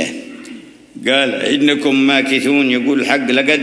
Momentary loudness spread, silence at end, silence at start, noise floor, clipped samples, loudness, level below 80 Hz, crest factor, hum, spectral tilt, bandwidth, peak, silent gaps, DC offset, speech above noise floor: 18 LU; 0 s; 0 s; -36 dBFS; under 0.1%; -14 LUFS; -64 dBFS; 16 dB; none; -3.5 dB/octave; 11 kHz; 0 dBFS; none; under 0.1%; 22 dB